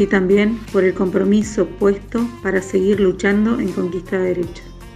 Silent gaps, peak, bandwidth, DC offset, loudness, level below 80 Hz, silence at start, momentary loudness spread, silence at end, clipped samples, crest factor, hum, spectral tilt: none; -2 dBFS; 12 kHz; under 0.1%; -18 LUFS; -40 dBFS; 0 s; 7 LU; 0 s; under 0.1%; 16 dB; none; -6.5 dB/octave